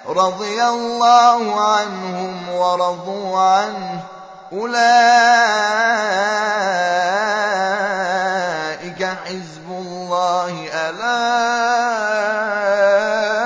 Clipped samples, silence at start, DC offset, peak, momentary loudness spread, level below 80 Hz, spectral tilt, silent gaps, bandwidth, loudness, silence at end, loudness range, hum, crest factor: under 0.1%; 0 s; under 0.1%; 0 dBFS; 15 LU; -70 dBFS; -3 dB/octave; none; 8 kHz; -17 LUFS; 0 s; 6 LU; none; 16 dB